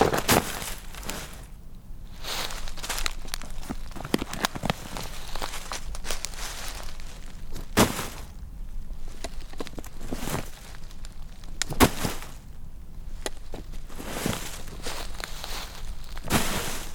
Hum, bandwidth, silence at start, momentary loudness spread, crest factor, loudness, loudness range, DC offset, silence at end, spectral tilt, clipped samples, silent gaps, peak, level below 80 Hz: none; over 20 kHz; 0 s; 21 LU; 30 dB; -30 LUFS; 6 LU; under 0.1%; 0 s; -3.5 dB/octave; under 0.1%; none; 0 dBFS; -36 dBFS